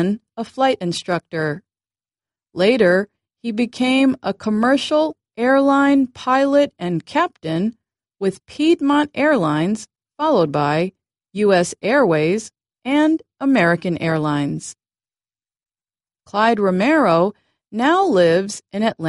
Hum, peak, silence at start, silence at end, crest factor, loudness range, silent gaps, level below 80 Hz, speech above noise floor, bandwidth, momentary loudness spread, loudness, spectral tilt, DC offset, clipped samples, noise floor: none; -2 dBFS; 0 s; 0 s; 16 dB; 3 LU; none; -60 dBFS; over 73 dB; 11.5 kHz; 11 LU; -18 LUFS; -5.5 dB/octave; under 0.1%; under 0.1%; under -90 dBFS